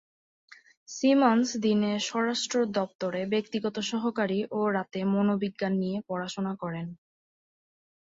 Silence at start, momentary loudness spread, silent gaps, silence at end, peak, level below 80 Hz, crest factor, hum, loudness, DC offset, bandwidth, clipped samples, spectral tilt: 0.5 s; 9 LU; 0.77-0.86 s, 2.95-2.99 s; 1.15 s; -8 dBFS; -72 dBFS; 20 dB; none; -28 LUFS; under 0.1%; 8 kHz; under 0.1%; -5 dB/octave